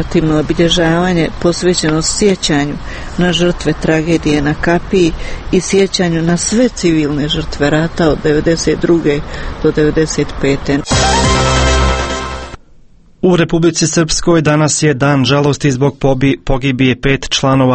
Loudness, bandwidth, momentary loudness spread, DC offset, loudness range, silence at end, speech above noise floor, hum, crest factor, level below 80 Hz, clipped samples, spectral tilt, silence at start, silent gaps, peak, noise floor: -12 LUFS; 8.8 kHz; 5 LU; under 0.1%; 2 LU; 0 s; 29 dB; none; 12 dB; -24 dBFS; under 0.1%; -5 dB/octave; 0 s; none; 0 dBFS; -41 dBFS